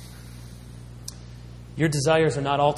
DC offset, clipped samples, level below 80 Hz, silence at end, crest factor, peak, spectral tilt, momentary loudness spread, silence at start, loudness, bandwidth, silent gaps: under 0.1%; under 0.1%; -46 dBFS; 0 s; 18 dB; -8 dBFS; -5.5 dB/octave; 22 LU; 0 s; -22 LUFS; 15 kHz; none